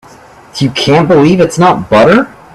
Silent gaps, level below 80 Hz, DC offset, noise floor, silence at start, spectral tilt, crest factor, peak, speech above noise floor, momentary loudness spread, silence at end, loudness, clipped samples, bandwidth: none; -40 dBFS; under 0.1%; -36 dBFS; 0.55 s; -6 dB/octave; 8 dB; 0 dBFS; 29 dB; 8 LU; 0.25 s; -8 LUFS; under 0.1%; 13 kHz